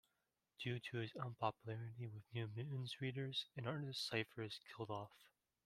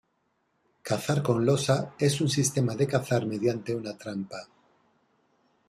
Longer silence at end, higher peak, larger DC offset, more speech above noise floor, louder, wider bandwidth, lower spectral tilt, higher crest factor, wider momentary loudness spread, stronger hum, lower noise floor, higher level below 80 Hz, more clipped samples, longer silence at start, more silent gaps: second, 0.4 s vs 1.25 s; second, -26 dBFS vs -10 dBFS; neither; second, 42 dB vs 47 dB; second, -47 LUFS vs -27 LUFS; about the same, 14.5 kHz vs 14.5 kHz; about the same, -5.5 dB/octave vs -5.5 dB/octave; about the same, 22 dB vs 18 dB; second, 7 LU vs 11 LU; neither; first, -89 dBFS vs -74 dBFS; second, -82 dBFS vs -64 dBFS; neither; second, 0.6 s vs 0.85 s; neither